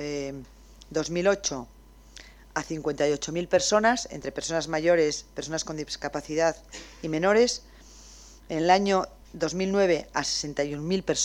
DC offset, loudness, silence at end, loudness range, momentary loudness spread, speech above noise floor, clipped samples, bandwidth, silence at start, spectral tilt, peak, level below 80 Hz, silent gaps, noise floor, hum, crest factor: under 0.1%; -26 LUFS; 0 s; 3 LU; 12 LU; 23 dB; under 0.1%; 16 kHz; 0 s; -3.5 dB/octave; -8 dBFS; -52 dBFS; none; -49 dBFS; none; 20 dB